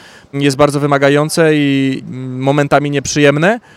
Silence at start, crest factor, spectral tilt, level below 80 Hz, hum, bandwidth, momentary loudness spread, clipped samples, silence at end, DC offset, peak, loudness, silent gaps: 0.35 s; 12 dB; -5.5 dB/octave; -48 dBFS; none; 15 kHz; 8 LU; 0.3%; 0.15 s; under 0.1%; 0 dBFS; -12 LUFS; none